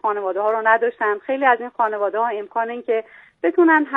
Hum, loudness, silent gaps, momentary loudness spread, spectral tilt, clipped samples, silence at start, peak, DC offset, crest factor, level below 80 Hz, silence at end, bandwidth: none; -20 LUFS; none; 8 LU; -6.5 dB/octave; under 0.1%; 0.05 s; 0 dBFS; under 0.1%; 18 dB; -74 dBFS; 0 s; 3.9 kHz